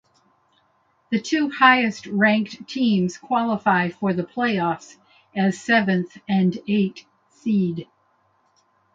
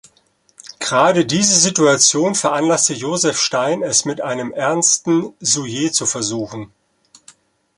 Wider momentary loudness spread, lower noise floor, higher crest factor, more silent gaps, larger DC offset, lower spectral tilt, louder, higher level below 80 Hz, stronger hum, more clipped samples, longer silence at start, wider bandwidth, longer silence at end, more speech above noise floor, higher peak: about the same, 10 LU vs 11 LU; first, -64 dBFS vs -58 dBFS; about the same, 22 dB vs 18 dB; neither; neither; first, -6 dB/octave vs -2.5 dB/octave; second, -21 LUFS vs -15 LUFS; second, -66 dBFS vs -60 dBFS; neither; neither; first, 1.1 s vs 0.65 s; second, 7.8 kHz vs 11.5 kHz; about the same, 1.1 s vs 1.1 s; about the same, 43 dB vs 42 dB; about the same, -2 dBFS vs 0 dBFS